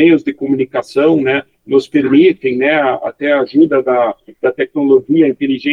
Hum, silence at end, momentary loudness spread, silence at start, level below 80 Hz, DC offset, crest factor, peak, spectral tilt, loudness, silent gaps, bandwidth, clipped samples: none; 0 s; 7 LU; 0 s; -58 dBFS; under 0.1%; 12 dB; 0 dBFS; -7 dB/octave; -13 LUFS; none; 7.2 kHz; under 0.1%